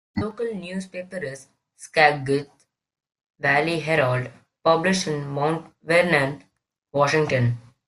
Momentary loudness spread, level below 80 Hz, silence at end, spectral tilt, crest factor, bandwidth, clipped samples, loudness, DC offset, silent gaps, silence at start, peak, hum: 14 LU; -58 dBFS; 0.25 s; -5 dB/octave; 20 dB; 12.5 kHz; under 0.1%; -22 LUFS; under 0.1%; 3.26-3.34 s; 0.15 s; -4 dBFS; none